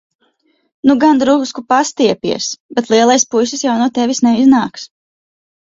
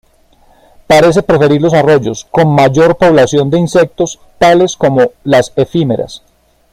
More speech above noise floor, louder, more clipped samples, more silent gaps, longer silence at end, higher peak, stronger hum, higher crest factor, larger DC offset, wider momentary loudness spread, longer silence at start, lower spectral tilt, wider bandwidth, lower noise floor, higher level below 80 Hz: first, 47 dB vs 38 dB; second, -13 LUFS vs -10 LUFS; neither; first, 2.60-2.69 s vs none; first, 0.9 s vs 0.55 s; about the same, 0 dBFS vs 0 dBFS; neither; about the same, 14 dB vs 10 dB; neither; about the same, 9 LU vs 7 LU; about the same, 0.85 s vs 0.9 s; second, -3.5 dB/octave vs -6 dB/octave; second, 7.8 kHz vs 15 kHz; first, -60 dBFS vs -47 dBFS; second, -56 dBFS vs -40 dBFS